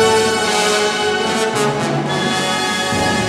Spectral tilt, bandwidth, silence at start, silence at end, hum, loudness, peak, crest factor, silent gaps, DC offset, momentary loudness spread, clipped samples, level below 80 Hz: -3 dB/octave; 15.5 kHz; 0 s; 0 s; none; -16 LUFS; -2 dBFS; 14 dB; none; under 0.1%; 3 LU; under 0.1%; -48 dBFS